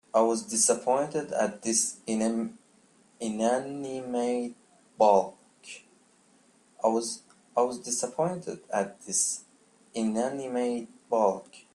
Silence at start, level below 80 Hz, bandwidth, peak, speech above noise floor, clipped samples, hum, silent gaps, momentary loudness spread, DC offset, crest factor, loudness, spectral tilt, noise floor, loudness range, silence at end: 0.15 s; -74 dBFS; 13 kHz; -8 dBFS; 35 dB; under 0.1%; none; none; 14 LU; under 0.1%; 22 dB; -28 LUFS; -3.5 dB/octave; -62 dBFS; 3 LU; 0.15 s